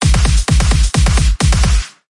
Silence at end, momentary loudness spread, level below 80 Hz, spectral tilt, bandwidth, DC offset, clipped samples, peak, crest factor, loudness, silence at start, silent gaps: 0.25 s; 2 LU; -12 dBFS; -4.5 dB/octave; 11.5 kHz; under 0.1%; under 0.1%; 0 dBFS; 10 dB; -14 LUFS; 0 s; none